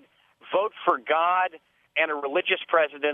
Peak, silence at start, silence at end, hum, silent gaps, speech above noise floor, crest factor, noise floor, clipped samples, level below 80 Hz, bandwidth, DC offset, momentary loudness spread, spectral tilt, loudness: -6 dBFS; 0.45 s; 0 s; none; none; 29 dB; 20 dB; -54 dBFS; under 0.1%; -84 dBFS; 3.9 kHz; under 0.1%; 6 LU; -5.5 dB/octave; -25 LUFS